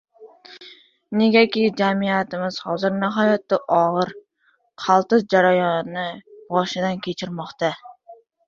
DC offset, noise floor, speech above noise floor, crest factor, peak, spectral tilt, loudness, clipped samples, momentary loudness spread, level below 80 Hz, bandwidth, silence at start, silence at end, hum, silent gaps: under 0.1%; -64 dBFS; 45 dB; 18 dB; -2 dBFS; -6 dB/octave; -20 LUFS; under 0.1%; 13 LU; -66 dBFS; 7.4 kHz; 0.2 s; 0.35 s; none; none